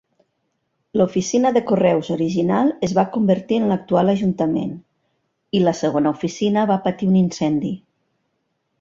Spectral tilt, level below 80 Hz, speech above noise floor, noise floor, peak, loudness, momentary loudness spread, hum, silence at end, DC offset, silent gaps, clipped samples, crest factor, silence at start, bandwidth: -6.5 dB/octave; -58 dBFS; 53 dB; -72 dBFS; -4 dBFS; -19 LUFS; 6 LU; none; 1.05 s; under 0.1%; none; under 0.1%; 16 dB; 0.95 s; 7.6 kHz